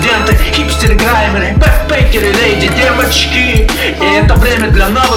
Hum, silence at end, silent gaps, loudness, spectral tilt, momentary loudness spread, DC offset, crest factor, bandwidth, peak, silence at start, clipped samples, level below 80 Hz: none; 0 s; none; -9 LUFS; -4.5 dB/octave; 2 LU; under 0.1%; 8 dB; 17.5 kHz; 0 dBFS; 0 s; 0.9%; -12 dBFS